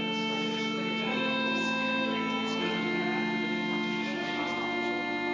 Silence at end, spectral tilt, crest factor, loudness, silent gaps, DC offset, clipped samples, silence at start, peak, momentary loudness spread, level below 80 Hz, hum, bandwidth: 0 s; -4.5 dB/octave; 12 dB; -30 LUFS; none; under 0.1%; under 0.1%; 0 s; -18 dBFS; 3 LU; -72 dBFS; none; 7.6 kHz